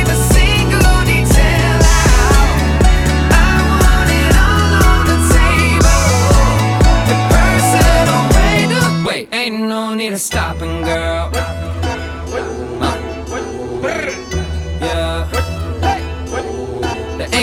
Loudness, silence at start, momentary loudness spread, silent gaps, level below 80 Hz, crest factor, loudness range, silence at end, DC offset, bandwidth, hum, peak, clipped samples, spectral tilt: -14 LUFS; 0 s; 11 LU; none; -16 dBFS; 12 dB; 9 LU; 0 s; under 0.1%; 16.5 kHz; none; 0 dBFS; under 0.1%; -4.5 dB/octave